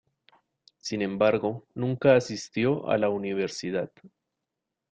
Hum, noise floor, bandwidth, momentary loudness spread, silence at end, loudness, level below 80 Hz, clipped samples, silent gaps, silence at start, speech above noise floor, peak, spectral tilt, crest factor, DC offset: none; -85 dBFS; 9 kHz; 11 LU; 0.85 s; -27 LUFS; -66 dBFS; under 0.1%; none; 0.85 s; 59 dB; -8 dBFS; -6 dB/octave; 20 dB; under 0.1%